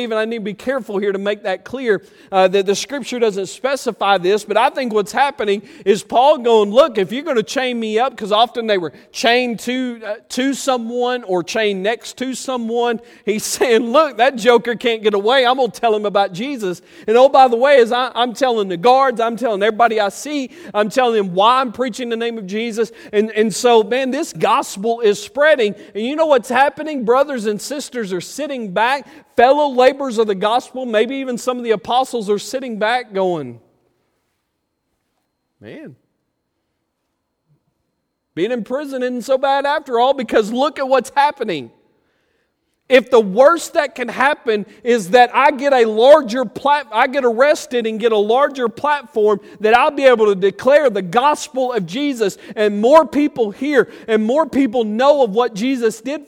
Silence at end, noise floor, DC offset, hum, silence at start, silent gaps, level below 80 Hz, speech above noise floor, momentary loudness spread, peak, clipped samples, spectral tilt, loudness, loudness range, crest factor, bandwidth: 0.05 s; -72 dBFS; under 0.1%; none; 0 s; none; -62 dBFS; 56 dB; 10 LU; 0 dBFS; under 0.1%; -4 dB/octave; -16 LUFS; 6 LU; 16 dB; 16.5 kHz